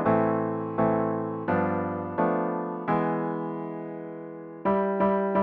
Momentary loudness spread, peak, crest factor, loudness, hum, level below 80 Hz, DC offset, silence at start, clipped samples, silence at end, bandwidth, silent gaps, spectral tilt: 12 LU; -10 dBFS; 16 dB; -27 LUFS; none; -60 dBFS; under 0.1%; 0 s; under 0.1%; 0 s; 4.5 kHz; none; -11 dB/octave